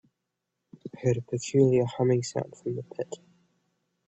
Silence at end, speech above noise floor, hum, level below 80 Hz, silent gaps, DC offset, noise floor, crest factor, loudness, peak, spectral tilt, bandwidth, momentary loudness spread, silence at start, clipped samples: 0.9 s; 56 dB; none; -64 dBFS; none; under 0.1%; -83 dBFS; 20 dB; -28 LUFS; -10 dBFS; -7 dB/octave; 8.2 kHz; 18 LU; 0.85 s; under 0.1%